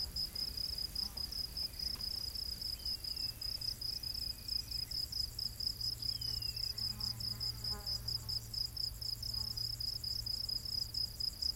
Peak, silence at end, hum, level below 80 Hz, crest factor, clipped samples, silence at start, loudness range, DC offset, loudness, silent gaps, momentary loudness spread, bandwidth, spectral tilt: -24 dBFS; 0 s; none; -52 dBFS; 16 dB; under 0.1%; 0 s; 1 LU; under 0.1%; -38 LUFS; none; 2 LU; 17 kHz; -2 dB/octave